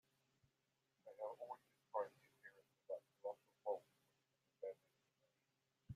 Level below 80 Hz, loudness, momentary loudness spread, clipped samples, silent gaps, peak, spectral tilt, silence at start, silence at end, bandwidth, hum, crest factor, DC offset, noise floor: -88 dBFS; -52 LUFS; 17 LU; under 0.1%; none; -32 dBFS; -6.5 dB/octave; 1.05 s; 0 s; 15 kHz; none; 22 dB; under 0.1%; -88 dBFS